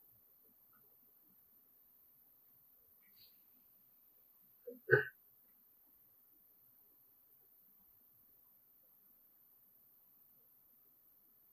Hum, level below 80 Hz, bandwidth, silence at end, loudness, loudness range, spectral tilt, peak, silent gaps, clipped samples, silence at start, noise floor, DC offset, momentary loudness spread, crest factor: none; under -90 dBFS; 15.5 kHz; 6.45 s; -37 LUFS; 22 LU; -7.5 dB/octave; -14 dBFS; none; under 0.1%; 4.65 s; -69 dBFS; under 0.1%; 10 LU; 34 dB